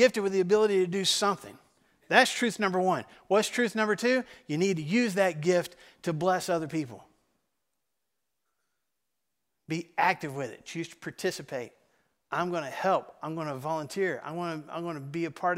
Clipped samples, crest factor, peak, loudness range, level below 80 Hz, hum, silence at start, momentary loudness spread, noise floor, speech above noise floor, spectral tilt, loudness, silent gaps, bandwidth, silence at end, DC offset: under 0.1%; 26 dB; -4 dBFS; 9 LU; -74 dBFS; none; 0 s; 13 LU; -85 dBFS; 56 dB; -4 dB/octave; -29 LUFS; none; 16 kHz; 0 s; under 0.1%